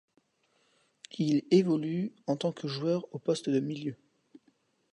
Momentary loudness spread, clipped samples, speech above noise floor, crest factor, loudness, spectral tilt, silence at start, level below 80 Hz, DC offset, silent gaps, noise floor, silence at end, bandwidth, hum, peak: 11 LU; under 0.1%; 43 dB; 20 dB; -30 LUFS; -7 dB/octave; 1.15 s; -78 dBFS; under 0.1%; none; -72 dBFS; 1 s; 10.5 kHz; none; -12 dBFS